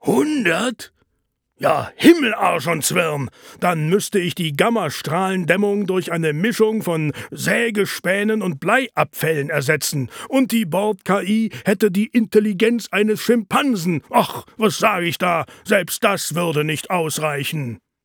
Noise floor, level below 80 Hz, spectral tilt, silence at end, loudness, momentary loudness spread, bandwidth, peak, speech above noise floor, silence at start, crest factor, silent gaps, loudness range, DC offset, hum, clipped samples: -71 dBFS; -62 dBFS; -4.5 dB/octave; 0.3 s; -19 LUFS; 6 LU; over 20 kHz; 0 dBFS; 53 dB; 0.05 s; 18 dB; none; 2 LU; under 0.1%; none; under 0.1%